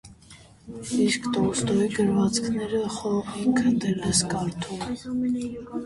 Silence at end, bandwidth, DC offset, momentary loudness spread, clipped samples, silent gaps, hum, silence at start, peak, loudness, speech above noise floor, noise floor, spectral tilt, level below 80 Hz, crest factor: 0 s; 11.5 kHz; under 0.1%; 9 LU; under 0.1%; none; none; 0.05 s; -8 dBFS; -25 LUFS; 25 dB; -50 dBFS; -4.5 dB/octave; -52 dBFS; 18 dB